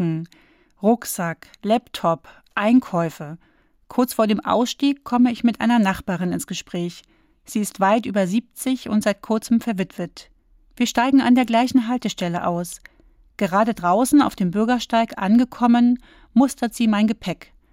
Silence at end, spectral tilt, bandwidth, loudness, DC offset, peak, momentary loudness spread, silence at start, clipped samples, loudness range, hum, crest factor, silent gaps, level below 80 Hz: 0.4 s; -5.5 dB/octave; 16.5 kHz; -20 LUFS; under 0.1%; -6 dBFS; 12 LU; 0 s; under 0.1%; 4 LU; none; 14 dB; none; -54 dBFS